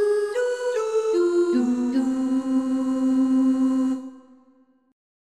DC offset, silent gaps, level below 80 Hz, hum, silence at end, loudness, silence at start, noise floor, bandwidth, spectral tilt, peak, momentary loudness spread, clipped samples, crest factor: under 0.1%; none; -68 dBFS; none; 1.15 s; -22 LUFS; 0 s; -59 dBFS; 10.5 kHz; -5 dB/octave; -10 dBFS; 5 LU; under 0.1%; 12 dB